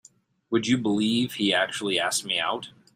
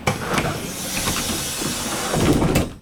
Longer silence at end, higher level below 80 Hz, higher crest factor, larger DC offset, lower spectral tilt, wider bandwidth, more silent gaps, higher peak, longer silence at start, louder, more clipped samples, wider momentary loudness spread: first, 0.25 s vs 0 s; second, -66 dBFS vs -34 dBFS; about the same, 18 dB vs 18 dB; neither; about the same, -3.5 dB/octave vs -4 dB/octave; second, 15.5 kHz vs over 20 kHz; neither; second, -8 dBFS vs -4 dBFS; first, 0.5 s vs 0 s; second, -25 LUFS vs -21 LUFS; neither; about the same, 5 LU vs 6 LU